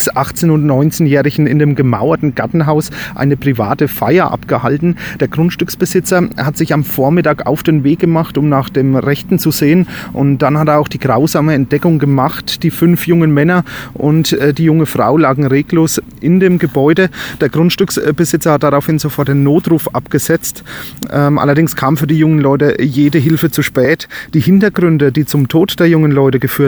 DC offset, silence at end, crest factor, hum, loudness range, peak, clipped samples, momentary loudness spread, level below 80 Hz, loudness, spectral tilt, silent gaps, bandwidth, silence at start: under 0.1%; 0 s; 12 dB; none; 2 LU; 0 dBFS; under 0.1%; 5 LU; -42 dBFS; -12 LUFS; -6.5 dB/octave; none; over 20 kHz; 0 s